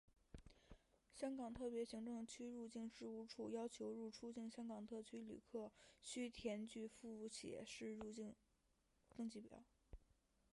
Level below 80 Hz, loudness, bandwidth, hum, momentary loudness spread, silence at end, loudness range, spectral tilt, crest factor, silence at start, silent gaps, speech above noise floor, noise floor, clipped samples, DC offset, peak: -74 dBFS; -53 LUFS; 11.5 kHz; none; 17 LU; 0.55 s; 4 LU; -4.5 dB/octave; 18 dB; 0.35 s; none; 31 dB; -83 dBFS; under 0.1%; under 0.1%; -34 dBFS